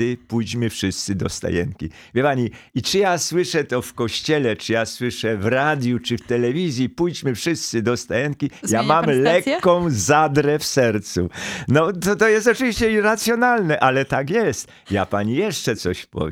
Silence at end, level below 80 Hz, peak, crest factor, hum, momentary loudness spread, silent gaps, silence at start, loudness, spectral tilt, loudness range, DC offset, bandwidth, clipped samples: 0 s; -48 dBFS; -2 dBFS; 18 dB; none; 8 LU; none; 0 s; -20 LUFS; -4.5 dB/octave; 4 LU; under 0.1%; 17 kHz; under 0.1%